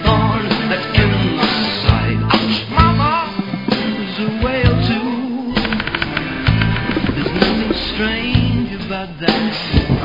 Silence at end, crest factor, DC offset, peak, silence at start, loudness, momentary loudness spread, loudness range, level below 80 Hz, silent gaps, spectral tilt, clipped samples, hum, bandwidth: 0 s; 16 dB; 0.4%; 0 dBFS; 0 s; -17 LUFS; 6 LU; 3 LU; -28 dBFS; none; -7.5 dB/octave; under 0.1%; none; 5.4 kHz